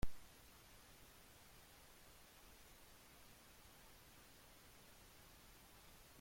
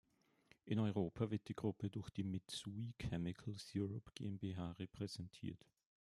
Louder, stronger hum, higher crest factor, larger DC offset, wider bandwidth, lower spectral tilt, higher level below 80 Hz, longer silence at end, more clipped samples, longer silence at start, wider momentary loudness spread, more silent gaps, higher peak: second, -63 LUFS vs -46 LUFS; neither; about the same, 24 dB vs 20 dB; neither; first, 16.5 kHz vs 12.5 kHz; second, -3.5 dB/octave vs -6.5 dB/octave; first, -62 dBFS vs -70 dBFS; second, 0 s vs 0.6 s; neither; second, 0 s vs 0.65 s; second, 0 LU vs 9 LU; neither; about the same, -28 dBFS vs -26 dBFS